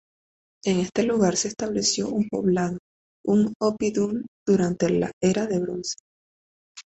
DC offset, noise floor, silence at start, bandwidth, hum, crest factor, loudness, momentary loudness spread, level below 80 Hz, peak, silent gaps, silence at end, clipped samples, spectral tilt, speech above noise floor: under 0.1%; under -90 dBFS; 0.65 s; 8.2 kHz; none; 18 dB; -24 LUFS; 9 LU; -56 dBFS; -8 dBFS; 2.79-3.24 s, 3.55-3.60 s, 4.28-4.46 s, 5.13-5.21 s, 6.00-6.75 s; 0.05 s; under 0.1%; -5 dB/octave; over 67 dB